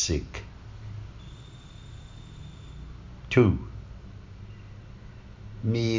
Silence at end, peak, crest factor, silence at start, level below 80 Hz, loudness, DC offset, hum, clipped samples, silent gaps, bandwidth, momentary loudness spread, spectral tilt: 0 s; -6 dBFS; 24 dB; 0 s; -44 dBFS; -28 LUFS; under 0.1%; none; under 0.1%; none; 7.6 kHz; 22 LU; -5.5 dB/octave